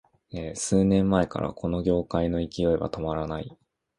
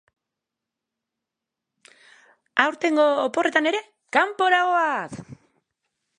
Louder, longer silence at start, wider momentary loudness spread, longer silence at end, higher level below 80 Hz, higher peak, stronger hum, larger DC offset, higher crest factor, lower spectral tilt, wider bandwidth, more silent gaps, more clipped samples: second, -26 LUFS vs -21 LUFS; second, 0.35 s vs 2.55 s; first, 14 LU vs 10 LU; second, 0.45 s vs 0.85 s; first, -44 dBFS vs -70 dBFS; about the same, -6 dBFS vs -4 dBFS; neither; neither; about the same, 20 dB vs 22 dB; first, -6.5 dB/octave vs -3.5 dB/octave; about the same, 11.5 kHz vs 11 kHz; neither; neither